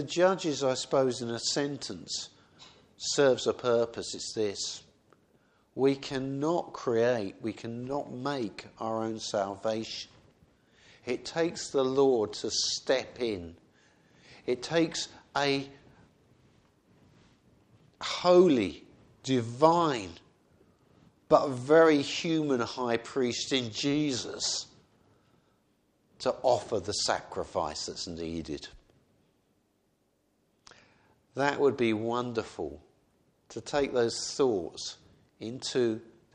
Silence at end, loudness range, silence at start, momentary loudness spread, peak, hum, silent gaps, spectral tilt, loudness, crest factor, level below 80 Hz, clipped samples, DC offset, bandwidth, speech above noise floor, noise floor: 0.3 s; 8 LU; 0 s; 15 LU; -6 dBFS; none; none; -4 dB/octave; -30 LUFS; 24 dB; -64 dBFS; under 0.1%; under 0.1%; 10 kHz; 44 dB; -73 dBFS